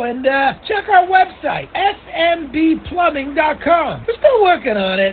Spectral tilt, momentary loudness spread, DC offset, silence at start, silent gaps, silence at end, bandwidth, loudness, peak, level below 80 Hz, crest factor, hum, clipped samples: -10 dB/octave; 6 LU; under 0.1%; 0 s; none; 0 s; 4.7 kHz; -15 LUFS; 0 dBFS; -44 dBFS; 16 dB; none; under 0.1%